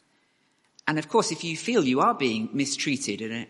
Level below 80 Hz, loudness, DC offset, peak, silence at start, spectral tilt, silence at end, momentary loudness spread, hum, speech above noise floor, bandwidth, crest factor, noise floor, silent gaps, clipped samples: -72 dBFS; -25 LUFS; under 0.1%; -6 dBFS; 0.85 s; -4 dB/octave; 0.05 s; 7 LU; none; 42 dB; 11.5 kHz; 22 dB; -68 dBFS; none; under 0.1%